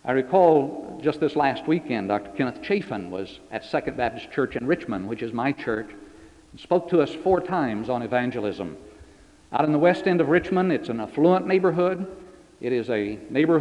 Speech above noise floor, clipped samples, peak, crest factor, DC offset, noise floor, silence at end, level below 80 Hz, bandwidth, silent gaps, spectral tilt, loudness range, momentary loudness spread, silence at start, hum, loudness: 28 dB; under 0.1%; -6 dBFS; 18 dB; under 0.1%; -51 dBFS; 0 s; -56 dBFS; 10.5 kHz; none; -7.5 dB/octave; 6 LU; 12 LU; 0.05 s; none; -24 LUFS